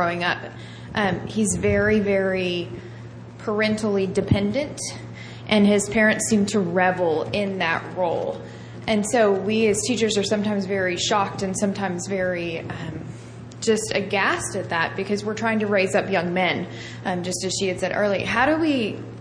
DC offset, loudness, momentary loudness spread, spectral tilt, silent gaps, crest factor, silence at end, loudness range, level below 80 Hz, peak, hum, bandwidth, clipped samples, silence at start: under 0.1%; -22 LUFS; 13 LU; -4.5 dB/octave; none; 18 dB; 0 s; 4 LU; -50 dBFS; -4 dBFS; none; 10.5 kHz; under 0.1%; 0 s